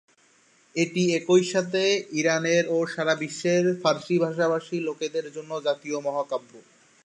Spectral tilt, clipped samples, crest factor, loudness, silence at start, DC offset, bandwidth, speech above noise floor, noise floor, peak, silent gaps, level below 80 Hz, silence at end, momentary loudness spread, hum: -4.5 dB/octave; under 0.1%; 18 dB; -25 LUFS; 0.75 s; under 0.1%; 10.5 kHz; 36 dB; -61 dBFS; -6 dBFS; none; -76 dBFS; 0.45 s; 9 LU; none